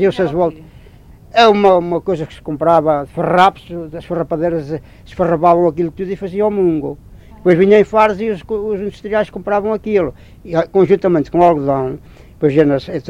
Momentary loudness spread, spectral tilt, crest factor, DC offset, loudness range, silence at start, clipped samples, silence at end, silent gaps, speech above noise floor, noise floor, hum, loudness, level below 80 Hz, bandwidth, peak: 13 LU; -7.5 dB/octave; 14 dB; under 0.1%; 3 LU; 0 s; under 0.1%; 0 s; none; 26 dB; -40 dBFS; none; -15 LUFS; -42 dBFS; 10.5 kHz; 0 dBFS